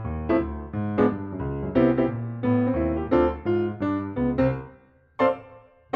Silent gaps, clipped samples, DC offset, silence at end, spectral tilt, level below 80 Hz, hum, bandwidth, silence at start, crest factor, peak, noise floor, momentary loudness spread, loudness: none; under 0.1%; under 0.1%; 0.35 s; -10.5 dB/octave; -42 dBFS; none; 5.4 kHz; 0 s; 18 dB; -6 dBFS; -54 dBFS; 9 LU; -25 LUFS